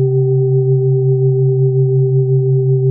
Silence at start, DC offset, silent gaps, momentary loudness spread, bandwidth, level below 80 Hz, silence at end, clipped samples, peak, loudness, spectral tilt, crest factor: 0 s; under 0.1%; none; 0 LU; 0.8 kHz; -66 dBFS; 0 s; under 0.1%; -4 dBFS; -13 LUFS; -18.5 dB/octave; 8 dB